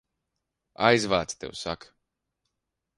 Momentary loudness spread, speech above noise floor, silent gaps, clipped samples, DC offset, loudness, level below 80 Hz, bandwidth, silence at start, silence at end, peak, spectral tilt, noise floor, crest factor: 13 LU; 58 dB; none; under 0.1%; under 0.1%; -26 LUFS; -58 dBFS; 11.5 kHz; 0.8 s; 1.25 s; -6 dBFS; -4 dB/octave; -83 dBFS; 24 dB